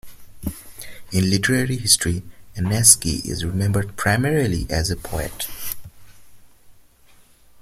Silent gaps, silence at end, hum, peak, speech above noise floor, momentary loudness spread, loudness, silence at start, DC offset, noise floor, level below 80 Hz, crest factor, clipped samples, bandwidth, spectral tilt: none; 0.9 s; none; 0 dBFS; 31 dB; 19 LU; -19 LUFS; 0.05 s; under 0.1%; -51 dBFS; -40 dBFS; 22 dB; under 0.1%; 16.5 kHz; -3.5 dB/octave